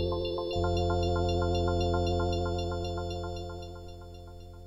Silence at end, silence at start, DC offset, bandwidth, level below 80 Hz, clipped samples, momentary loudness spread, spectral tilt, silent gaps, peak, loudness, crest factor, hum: 0 s; 0 s; under 0.1%; 11 kHz; -42 dBFS; under 0.1%; 17 LU; -7 dB/octave; none; -16 dBFS; -31 LUFS; 14 dB; none